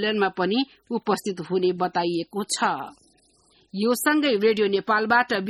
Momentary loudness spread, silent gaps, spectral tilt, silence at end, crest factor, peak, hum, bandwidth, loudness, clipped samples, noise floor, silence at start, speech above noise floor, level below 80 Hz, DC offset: 9 LU; none; -4 dB/octave; 0 s; 18 dB; -6 dBFS; none; 14 kHz; -23 LUFS; under 0.1%; -61 dBFS; 0 s; 38 dB; -68 dBFS; under 0.1%